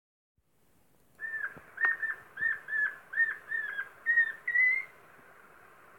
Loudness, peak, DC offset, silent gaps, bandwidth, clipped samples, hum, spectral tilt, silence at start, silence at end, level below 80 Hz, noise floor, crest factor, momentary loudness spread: -30 LUFS; -14 dBFS; under 0.1%; none; 17 kHz; under 0.1%; none; -2.5 dB/octave; 1.2 s; 1.1 s; -78 dBFS; -70 dBFS; 20 dB; 12 LU